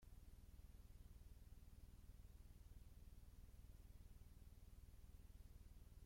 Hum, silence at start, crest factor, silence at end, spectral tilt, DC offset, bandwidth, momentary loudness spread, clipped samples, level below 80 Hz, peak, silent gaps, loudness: none; 0 s; 12 dB; 0 s; -5.5 dB/octave; under 0.1%; 16.5 kHz; 1 LU; under 0.1%; -64 dBFS; -50 dBFS; none; -67 LUFS